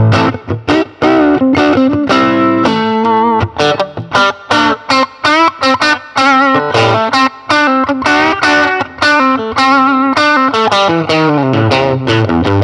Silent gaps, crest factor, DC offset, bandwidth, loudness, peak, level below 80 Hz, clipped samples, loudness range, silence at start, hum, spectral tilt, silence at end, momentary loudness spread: none; 10 dB; under 0.1%; 11 kHz; -10 LUFS; 0 dBFS; -42 dBFS; under 0.1%; 1 LU; 0 s; none; -5.5 dB/octave; 0 s; 3 LU